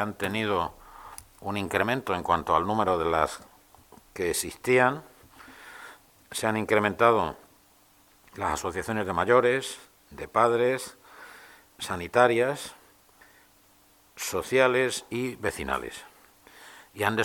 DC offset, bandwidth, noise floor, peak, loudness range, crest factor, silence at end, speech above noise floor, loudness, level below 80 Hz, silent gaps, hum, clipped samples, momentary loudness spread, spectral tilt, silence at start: under 0.1%; 19 kHz; -60 dBFS; -4 dBFS; 3 LU; 24 dB; 0 s; 34 dB; -26 LUFS; -56 dBFS; none; none; under 0.1%; 23 LU; -4 dB/octave; 0 s